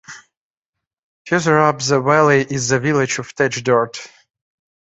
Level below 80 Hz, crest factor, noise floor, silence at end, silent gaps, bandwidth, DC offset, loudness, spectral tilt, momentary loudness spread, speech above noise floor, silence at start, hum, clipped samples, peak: -58 dBFS; 18 dB; -84 dBFS; 0.9 s; 0.37-0.73 s, 0.87-0.97 s, 1.03-1.25 s; 8.4 kHz; under 0.1%; -16 LUFS; -4.5 dB/octave; 8 LU; 68 dB; 0.1 s; none; under 0.1%; -2 dBFS